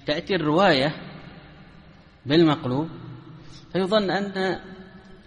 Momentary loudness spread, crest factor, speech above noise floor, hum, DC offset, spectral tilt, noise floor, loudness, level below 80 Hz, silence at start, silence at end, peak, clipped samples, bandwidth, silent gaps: 24 LU; 18 dB; 27 dB; none; under 0.1%; -6.5 dB/octave; -49 dBFS; -23 LUFS; -54 dBFS; 0.05 s; 0.1 s; -6 dBFS; under 0.1%; 10 kHz; none